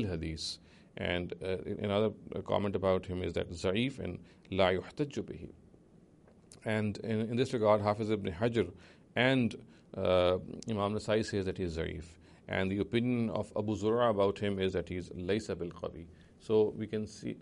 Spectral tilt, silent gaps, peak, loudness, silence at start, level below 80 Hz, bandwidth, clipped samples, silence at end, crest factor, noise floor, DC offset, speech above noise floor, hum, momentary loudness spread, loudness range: -6.5 dB/octave; none; -14 dBFS; -33 LUFS; 0 s; -58 dBFS; 11.5 kHz; under 0.1%; 0 s; 20 dB; -61 dBFS; under 0.1%; 28 dB; none; 14 LU; 4 LU